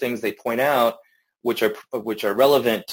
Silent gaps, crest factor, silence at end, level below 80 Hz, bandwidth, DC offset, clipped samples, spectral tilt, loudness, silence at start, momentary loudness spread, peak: none; 18 dB; 0 s; -66 dBFS; 17 kHz; under 0.1%; under 0.1%; -4.5 dB/octave; -21 LUFS; 0 s; 11 LU; -4 dBFS